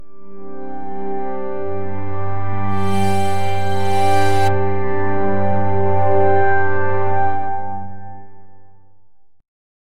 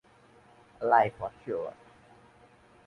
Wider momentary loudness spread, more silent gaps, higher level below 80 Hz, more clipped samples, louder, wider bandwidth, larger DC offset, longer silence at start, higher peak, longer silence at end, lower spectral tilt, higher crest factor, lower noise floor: first, 20 LU vs 15 LU; neither; first, -44 dBFS vs -66 dBFS; neither; first, -20 LUFS vs -29 LUFS; first, 14 kHz vs 10.5 kHz; first, 20% vs under 0.1%; second, 0 s vs 0.8 s; first, -2 dBFS vs -10 dBFS; second, 0.5 s vs 1.15 s; about the same, -6.5 dB/octave vs -7 dB/octave; second, 14 dB vs 24 dB; about the same, -57 dBFS vs -59 dBFS